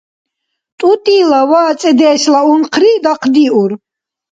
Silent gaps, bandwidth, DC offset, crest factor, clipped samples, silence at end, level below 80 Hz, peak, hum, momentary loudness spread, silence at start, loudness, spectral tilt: none; 9.2 kHz; under 0.1%; 10 dB; under 0.1%; 0.55 s; -62 dBFS; 0 dBFS; none; 5 LU; 0.8 s; -10 LUFS; -4 dB/octave